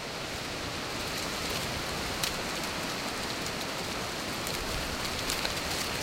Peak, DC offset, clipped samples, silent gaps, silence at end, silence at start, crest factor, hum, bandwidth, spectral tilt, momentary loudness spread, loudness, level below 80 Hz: -10 dBFS; under 0.1%; under 0.1%; none; 0 s; 0 s; 24 dB; none; 17 kHz; -2.5 dB/octave; 4 LU; -32 LUFS; -48 dBFS